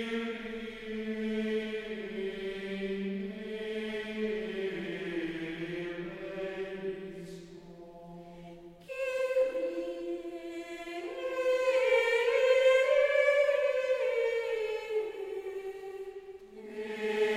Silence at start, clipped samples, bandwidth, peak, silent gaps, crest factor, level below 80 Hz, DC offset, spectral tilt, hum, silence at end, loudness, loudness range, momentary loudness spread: 0 s; under 0.1%; 14 kHz; -14 dBFS; none; 18 dB; -62 dBFS; under 0.1%; -5 dB/octave; none; 0 s; -32 LUFS; 12 LU; 20 LU